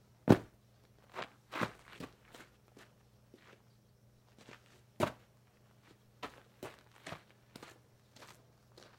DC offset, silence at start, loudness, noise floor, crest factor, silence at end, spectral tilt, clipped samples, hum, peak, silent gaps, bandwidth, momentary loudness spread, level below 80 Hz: under 0.1%; 0.25 s; -38 LUFS; -66 dBFS; 34 dB; 0.65 s; -6.5 dB/octave; under 0.1%; none; -8 dBFS; none; 16.5 kHz; 30 LU; -70 dBFS